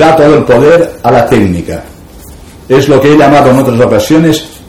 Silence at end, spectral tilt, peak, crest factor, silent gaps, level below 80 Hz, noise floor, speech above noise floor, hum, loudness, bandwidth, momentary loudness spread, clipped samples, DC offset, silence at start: 0.1 s; -6.5 dB/octave; 0 dBFS; 6 dB; none; -32 dBFS; -30 dBFS; 25 dB; none; -6 LUFS; 17 kHz; 7 LU; 6%; 1%; 0 s